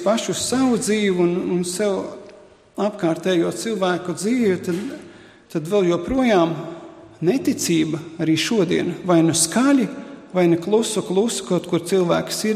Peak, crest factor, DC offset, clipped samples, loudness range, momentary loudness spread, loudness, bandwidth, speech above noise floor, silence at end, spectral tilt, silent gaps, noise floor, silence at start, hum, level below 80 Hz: -4 dBFS; 16 dB; under 0.1%; under 0.1%; 4 LU; 10 LU; -20 LUFS; 15.5 kHz; 27 dB; 0 s; -4.5 dB/octave; none; -46 dBFS; 0 s; none; -54 dBFS